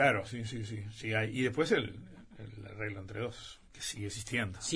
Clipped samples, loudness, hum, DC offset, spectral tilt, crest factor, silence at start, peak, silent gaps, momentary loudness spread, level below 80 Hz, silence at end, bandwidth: under 0.1%; -35 LUFS; none; under 0.1%; -4.5 dB/octave; 22 dB; 0 s; -14 dBFS; none; 19 LU; -60 dBFS; 0 s; 11 kHz